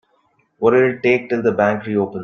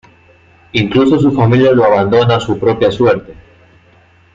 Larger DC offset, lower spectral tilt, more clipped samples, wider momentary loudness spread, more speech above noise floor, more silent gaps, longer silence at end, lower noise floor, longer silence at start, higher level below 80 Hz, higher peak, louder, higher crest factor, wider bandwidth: neither; about the same, -8 dB/octave vs -7.5 dB/octave; neither; about the same, 5 LU vs 6 LU; first, 45 dB vs 36 dB; neither; second, 0 s vs 1 s; first, -62 dBFS vs -47 dBFS; second, 0.6 s vs 0.75 s; second, -60 dBFS vs -44 dBFS; about the same, -2 dBFS vs 0 dBFS; second, -17 LUFS vs -11 LUFS; about the same, 16 dB vs 12 dB; second, 6.6 kHz vs 7.6 kHz